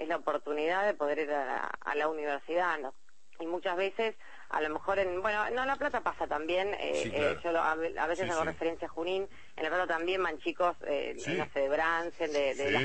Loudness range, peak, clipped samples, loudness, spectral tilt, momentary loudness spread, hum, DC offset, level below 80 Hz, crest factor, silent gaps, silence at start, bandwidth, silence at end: 2 LU; -14 dBFS; under 0.1%; -32 LUFS; -4 dB/octave; 6 LU; none; 0.5%; -62 dBFS; 18 dB; none; 0 s; 8.8 kHz; 0 s